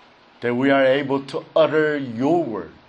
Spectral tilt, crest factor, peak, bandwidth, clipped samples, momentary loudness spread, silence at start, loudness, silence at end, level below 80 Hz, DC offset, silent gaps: -7 dB/octave; 16 dB; -4 dBFS; 9.2 kHz; under 0.1%; 8 LU; 0.4 s; -20 LUFS; 0.15 s; -64 dBFS; under 0.1%; none